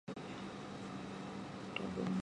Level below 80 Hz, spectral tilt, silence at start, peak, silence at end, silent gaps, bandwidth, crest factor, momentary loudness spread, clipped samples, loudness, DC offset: -68 dBFS; -6 dB/octave; 0.05 s; -24 dBFS; 0 s; none; 11 kHz; 20 dB; 7 LU; under 0.1%; -45 LUFS; under 0.1%